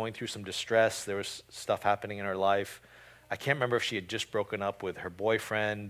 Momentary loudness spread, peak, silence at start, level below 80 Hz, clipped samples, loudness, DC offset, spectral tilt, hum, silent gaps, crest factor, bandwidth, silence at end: 10 LU; -12 dBFS; 0 s; -64 dBFS; under 0.1%; -32 LUFS; under 0.1%; -4 dB/octave; none; none; 20 dB; 16 kHz; 0 s